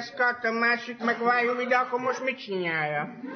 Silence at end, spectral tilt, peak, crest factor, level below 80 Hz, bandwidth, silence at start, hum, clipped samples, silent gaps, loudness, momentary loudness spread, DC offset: 0 s; -5 dB/octave; -10 dBFS; 16 dB; -78 dBFS; 6.6 kHz; 0 s; none; under 0.1%; none; -26 LUFS; 6 LU; under 0.1%